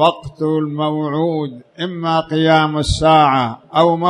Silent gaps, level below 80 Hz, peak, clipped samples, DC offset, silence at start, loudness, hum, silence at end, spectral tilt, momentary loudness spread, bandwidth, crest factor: none; -36 dBFS; 0 dBFS; under 0.1%; under 0.1%; 0 s; -16 LUFS; none; 0 s; -6 dB/octave; 11 LU; 11 kHz; 16 dB